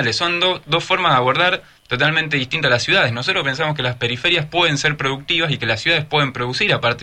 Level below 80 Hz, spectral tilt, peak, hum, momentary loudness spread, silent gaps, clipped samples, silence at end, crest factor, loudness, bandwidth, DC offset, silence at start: -50 dBFS; -4 dB/octave; -2 dBFS; none; 5 LU; none; under 0.1%; 0 s; 16 dB; -17 LUFS; 11 kHz; under 0.1%; 0 s